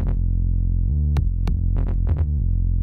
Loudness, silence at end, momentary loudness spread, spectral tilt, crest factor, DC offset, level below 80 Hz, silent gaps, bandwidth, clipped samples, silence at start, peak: -23 LUFS; 0 s; 2 LU; -10 dB/octave; 10 dB; under 0.1%; -20 dBFS; none; 4.3 kHz; under 0.1%; 0 s; -10 dBFS